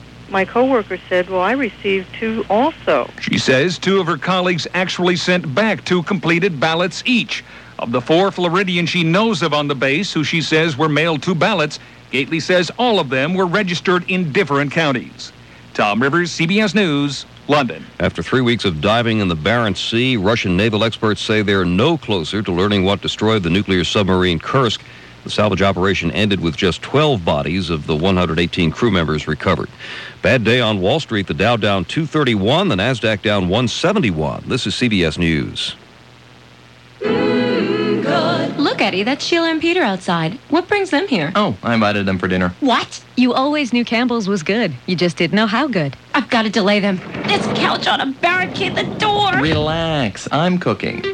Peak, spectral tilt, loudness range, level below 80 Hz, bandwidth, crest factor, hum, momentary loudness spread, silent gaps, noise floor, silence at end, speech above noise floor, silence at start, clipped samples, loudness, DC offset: -4 dBFS; -5.5 dB/octave; 2 LU; -44 dBFS; 11 kHz; 14 dB; none; 5 LU; none; -43 dBFS; 0 s; 27 dB; 0 s; under 0.1%; -17 LUFS; under 0.1%